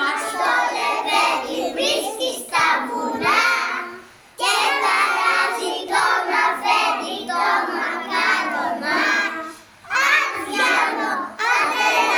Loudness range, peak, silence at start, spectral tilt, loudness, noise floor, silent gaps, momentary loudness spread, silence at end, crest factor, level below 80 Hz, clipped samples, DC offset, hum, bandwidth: 2 LU; -4 dBFS; 0 s; -1 dB/octave; -19 LUFS; -41 dBFS; none; 7 LU; 0 s; 16 dB; -66 dBFS; under 0.1%; under 0.1%; none; over 20 kHz